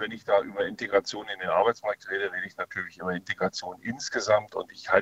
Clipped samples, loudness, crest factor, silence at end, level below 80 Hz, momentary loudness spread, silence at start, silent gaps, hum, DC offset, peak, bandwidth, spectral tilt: under 0.1%; -28 LUFS; 24 dB; 0 s; -66 dBFS; 9 LU; 0 s; none; none; under 0.1%; -4 dBFS; 8.2 kHz; -3.5 dB/octave